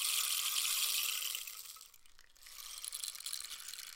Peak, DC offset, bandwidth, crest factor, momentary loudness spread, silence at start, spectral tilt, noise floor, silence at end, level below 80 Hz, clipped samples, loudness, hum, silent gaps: -20 dBFS; under 0.1%; 17 kHz; 20 dB; 17 LU; 0 s; 5 dB/octave; -60 dBFS; 0 s; -74 dBFS; under 0.1%; -36 LUFS; none; none